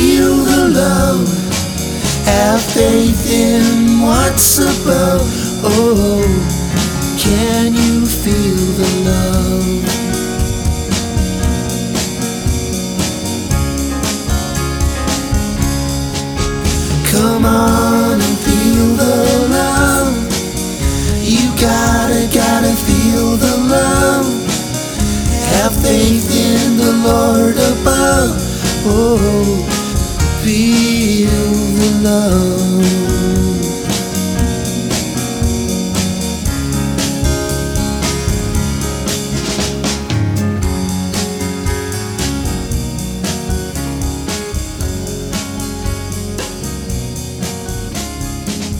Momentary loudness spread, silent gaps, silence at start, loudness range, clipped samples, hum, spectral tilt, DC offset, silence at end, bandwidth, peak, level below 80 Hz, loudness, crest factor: 9 LU; none; 0 s; 7 LU; under 0.1%; none; -4.5 dB/octave; under 0.1%; 0 s; over 20 kHz; 0 dBFS; -24 dBFS; -14 LUFS; 14 dB